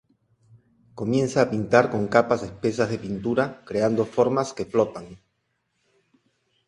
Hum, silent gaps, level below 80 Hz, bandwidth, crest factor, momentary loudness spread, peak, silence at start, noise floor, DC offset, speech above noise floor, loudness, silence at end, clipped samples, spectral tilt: none; none; -58 dBFS; 11 kHz; 24 dB; 8 LU; 0 dBFS; 0.95 s; -74 dBFS; under 0.1%; 51 dB; -23 LUFS; 1.5 s; under 0.1%; -6.5 dB/octave